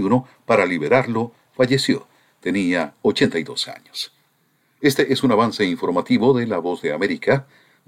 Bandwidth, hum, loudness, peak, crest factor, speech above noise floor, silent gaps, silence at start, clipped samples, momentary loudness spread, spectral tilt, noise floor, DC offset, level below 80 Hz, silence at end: 16 kHz; none; -20 LUFS; -2 dBFS; 18 dB; 44 dB; none; 0 s; under 0.1%; 9 LU; -5.5 dB/octave; -63 dBFS; under 0.1%; -60 dBFS; 0.45 s